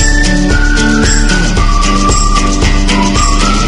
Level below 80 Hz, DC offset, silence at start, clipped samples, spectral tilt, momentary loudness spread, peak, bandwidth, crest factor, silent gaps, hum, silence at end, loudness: -10 dBFS; under 0.1%; 0 s; 0.2%; -4 dB/octave; 2 LU; 0 dBFS; 11 kHz; 8 dB; none; none; 0 s; -10 LUFS